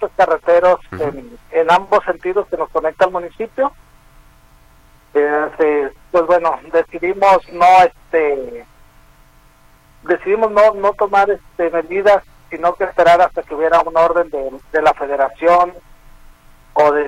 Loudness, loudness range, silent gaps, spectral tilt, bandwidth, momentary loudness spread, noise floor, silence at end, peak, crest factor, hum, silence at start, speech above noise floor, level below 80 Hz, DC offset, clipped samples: -15 LUFS; 5 LU; none; -5 dB/octave; 12.5 kHz; 10 LU; -48 dBFS; 0 s; -2 dBFS; 14 dB; none; 0 s; 34 dB; -46 dBFS; under 0.1%; under 0.1%